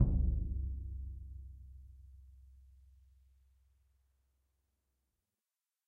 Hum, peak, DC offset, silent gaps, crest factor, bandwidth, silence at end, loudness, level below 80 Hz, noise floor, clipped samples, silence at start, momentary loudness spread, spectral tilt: none; -16 dBFS; under 0.1%; none; 24 dB; 1.2 kHz; 3.3 s; -40 LUFS; -42 dBFS; under -90 dBFS; under 0.1%; 0 s; 25 LU; -12.5 dB/octave